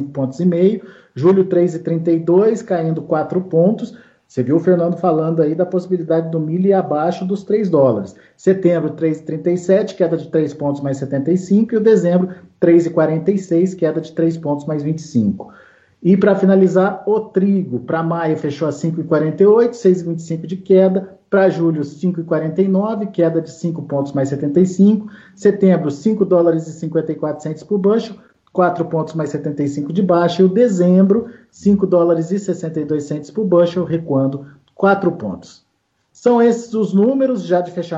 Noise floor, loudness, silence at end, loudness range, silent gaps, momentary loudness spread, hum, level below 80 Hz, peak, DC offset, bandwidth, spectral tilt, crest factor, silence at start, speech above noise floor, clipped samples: -66 dBFS; -16 LUFS; 0 s; 3 LU; none; 9 LU; none; -60 dBFS; -2 dBFS; under 0.1%; 7.8 kHz; -8.5 dB/octave; 14 dB; 0 s; 51 dB; under 0.1%